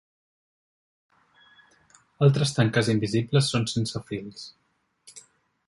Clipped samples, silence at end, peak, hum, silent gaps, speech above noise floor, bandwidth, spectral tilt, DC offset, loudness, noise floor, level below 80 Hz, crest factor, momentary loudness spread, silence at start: under 0.1%; 0.5 s; -6 dBFS; none; none; 40 dB; 11.5 kHz; -5.5 dB/octave; under 0.1%; -24 LUFS; -64 dBFS; -60 dBFS; 22 dB; 21 LU; 2.2 s